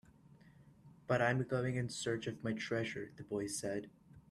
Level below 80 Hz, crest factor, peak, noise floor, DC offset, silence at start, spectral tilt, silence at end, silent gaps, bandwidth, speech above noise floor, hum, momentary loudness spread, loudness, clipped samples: -70 dBFS; 20 dB; -20 dBFS; -63 dBFS; under 0.1%; 0.3 s; -5 dB/octave; 0.1 s; none; 13.5 kHz; 25 dB; none; 11 LU; -38 LUFS; under 0.1%